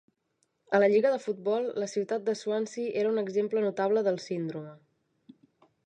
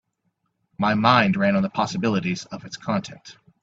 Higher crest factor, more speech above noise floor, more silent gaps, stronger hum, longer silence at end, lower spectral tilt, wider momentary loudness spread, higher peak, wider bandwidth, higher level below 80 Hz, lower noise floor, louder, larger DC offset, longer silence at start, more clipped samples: about the same, 20 dB vs 22 dB; about the same, 48 dB vs 51 dB; neither; neither; first, 1.1 s vs 0.3 s; about the same, -5.5 dB/octave vs -6 dB/octave; second, 10 LU vs 15 LU; second, -10 dBFS vs -2 dBFS; first, 9.2 kHz vs 7.8 kHz; second, -84 dBFS vs -58 dBFS; about the same, -76 dBFS vs -73 dBFS; second, -29 LUFS vs -22 LUFS; neither; about the same, 0.7 s vs 0.8 s; neither